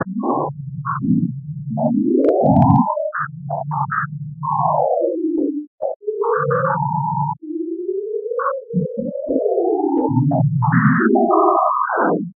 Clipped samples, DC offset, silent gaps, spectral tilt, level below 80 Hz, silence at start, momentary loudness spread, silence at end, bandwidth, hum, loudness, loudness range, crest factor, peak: under 0.1%; under 0.1%; 5.67-5.78 s, 5.96-6.00 s; -10.5 dB/octave; -54 dBFS; 0 s; 11 LU; 0.05 s; 2.6 kHz; none; -19 LUFS; 5 LU; 18 dB; 0 dBFS